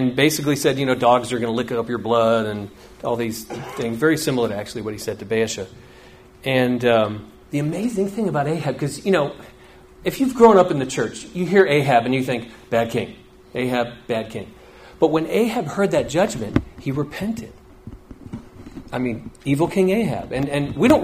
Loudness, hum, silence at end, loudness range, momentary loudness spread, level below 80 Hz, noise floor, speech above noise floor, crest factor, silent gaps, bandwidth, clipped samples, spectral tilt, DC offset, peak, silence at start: -21 LUFS; none; 0 s; 6 LU; 15 LU; -48 dBFS; -46 dBFS; 26 dB; 20 dB; none; 15.5 kHz; under 0.1%; -5.5 dB/octave; under 0.1%; 0 dBFS; 0 s